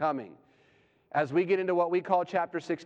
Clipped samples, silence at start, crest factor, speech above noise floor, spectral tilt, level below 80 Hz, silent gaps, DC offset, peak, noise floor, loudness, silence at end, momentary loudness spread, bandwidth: under 0.1%; 0 s; 18 dB; 37 dB; -7 dB/octave; -82 dBFS; none; under 0.1%; -12 dBFS; -65 dBFS; -29 LUFS; 0 s; 7 LU; 7.8 kHz